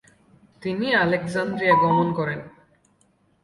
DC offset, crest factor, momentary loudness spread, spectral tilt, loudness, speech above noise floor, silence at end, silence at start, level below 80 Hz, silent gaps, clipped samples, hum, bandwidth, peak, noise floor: under 0.1%; 18 dB; 12 LU; -6.5 dB/octave; -21 LUFS; 42 dB; 0.95 s; 0.6 s; -60 dBFS; none; under 0.1%; none; 11.5 kHz; -6 dBFS; -63 dBFS